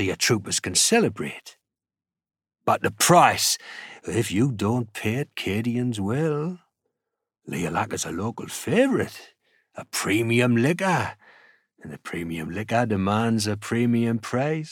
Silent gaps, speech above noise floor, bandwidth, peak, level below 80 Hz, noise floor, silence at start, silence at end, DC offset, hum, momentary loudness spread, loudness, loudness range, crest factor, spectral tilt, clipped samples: none; 60 dB; 18.5 kHz; -2 dBFS; -60 dBFS; -84 dBFS; 0 s; 0 s; under 0.1%; none; 14 LU; -23 LUFS; 6 LU; 22 dB; -4 dB/octave; under 0.1%